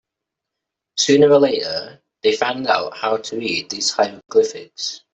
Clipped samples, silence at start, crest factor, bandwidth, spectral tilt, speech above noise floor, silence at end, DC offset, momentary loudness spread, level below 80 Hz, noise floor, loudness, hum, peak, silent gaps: under 0.1%; 0.95 s; 16 dB; 8.2 kHz; -3 dB/octave; 65 dB; 0.15 s; under 0.1%; 14 LU; -64 dBFS; -83 dBFS; -18 LUFS; none; -2 dBFS; none